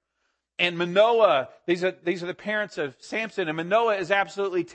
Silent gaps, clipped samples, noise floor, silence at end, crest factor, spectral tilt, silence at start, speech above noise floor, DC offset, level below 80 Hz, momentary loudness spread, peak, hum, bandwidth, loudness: none; under 0.1%; -76 dBFS; 0 s; 20 dB; -5 dB/octave; 0.6 s; 52 dB; under 0.1%; -74 dBFS; 10 LU; -6 dBFS; none; 8.6 kHz; -24 LUFS